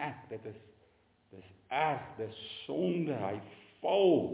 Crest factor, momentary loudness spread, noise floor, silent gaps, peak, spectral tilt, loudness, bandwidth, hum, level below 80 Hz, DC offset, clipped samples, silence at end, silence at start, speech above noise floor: 18 dB; 18 LU; -68 dBFS; none; -16 dBFS; -4.5 dB/octave; -34 LUFS; 4 kHz; none; -70 dBFS; under 0.1%; under 0.1%; 0 s; 0 s; 35 dB